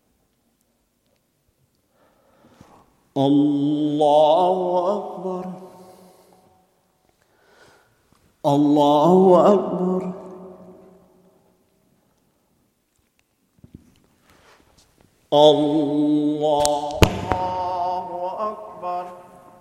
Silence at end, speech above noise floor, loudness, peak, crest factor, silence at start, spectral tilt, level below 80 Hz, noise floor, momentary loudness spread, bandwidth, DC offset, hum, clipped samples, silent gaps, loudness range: 0.4 s; 50 dB; -19 LUFS; 0 dBFS; 22 dB; 3.15 s; -6 dB/octave; -44 dBFS; -67 dBFS; 17 LU; 15 kHz; under 0.1%; none; under 0.1%; none; 11 LU